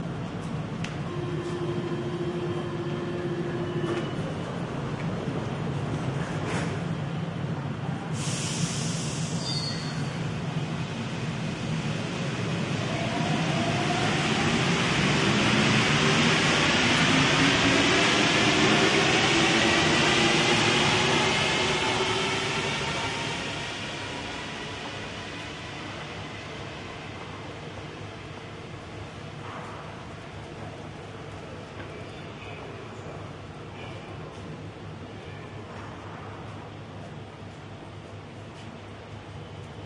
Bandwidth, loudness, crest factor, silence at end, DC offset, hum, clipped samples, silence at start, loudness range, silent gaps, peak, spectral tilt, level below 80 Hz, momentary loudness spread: 11.5 kHz; -25 LUFS; 18 dB; 0 s; under 0.1%; none; under 0.1%; 0 s; 19 LU; none; -8 dBFS; -4 dB/octave; -52 dBFS; 20 LU